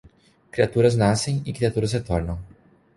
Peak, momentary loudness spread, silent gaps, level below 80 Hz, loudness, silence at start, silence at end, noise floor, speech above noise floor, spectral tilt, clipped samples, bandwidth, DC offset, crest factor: -4 dBFS; 13 LU; none; -40 dBFS; -22 LUFS; 0.55 s; 0.5 s; -50 dBFS; 29 dB; -6 dB/octave; under 0.1%; 11.5 kHz; under 0.1%; 20 dB